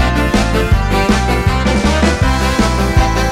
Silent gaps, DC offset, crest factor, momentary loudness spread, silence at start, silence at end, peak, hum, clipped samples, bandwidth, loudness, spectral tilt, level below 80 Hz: none; under 0.1%; 12 dB; 1 LU; 0 s; 0 s; 0 dBFS; none; under 0.1%; 15.5 kHz; -13 LUFS; -5.5 dB/octave; -16 dBFS